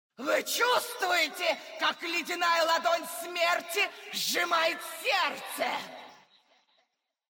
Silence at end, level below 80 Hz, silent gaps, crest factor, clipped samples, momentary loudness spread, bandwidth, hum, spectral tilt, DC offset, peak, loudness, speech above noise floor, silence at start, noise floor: 1.2 s; -90 dBFS; none; 16 dB; under 0.1%; 7 LU; 17 kHz; none; 0 dB/octave; under 0.1%; -14 dBFS; -28 LUFS; 47 dB; 0.2 s; -77 dBFS